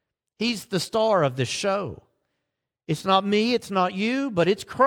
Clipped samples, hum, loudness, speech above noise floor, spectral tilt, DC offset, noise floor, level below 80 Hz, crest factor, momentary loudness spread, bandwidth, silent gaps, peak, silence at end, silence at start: under 0.1%; none; -24 LUFS; 59 dB; -5 dB/octave; under 0.1%; -82 dBFS; -62 dBFS; 20 dB; 8 LU; 17.5 kHz; none; -4 dBFS; 0 s; 0.4 s